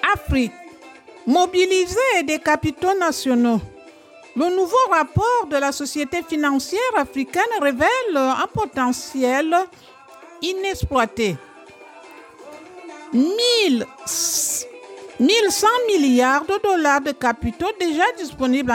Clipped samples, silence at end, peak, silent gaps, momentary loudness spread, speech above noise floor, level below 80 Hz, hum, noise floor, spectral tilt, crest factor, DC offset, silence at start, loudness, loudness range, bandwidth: under 0.1%; 0 s; -4 dBFS; none; 8 LU; 26 dB; -44 dBFS; none; -45 dBFS; -3.5 dB/octave; 16 dB; under 0.1%; 0 s; -19 LUFS; 5 LU; 17 kHz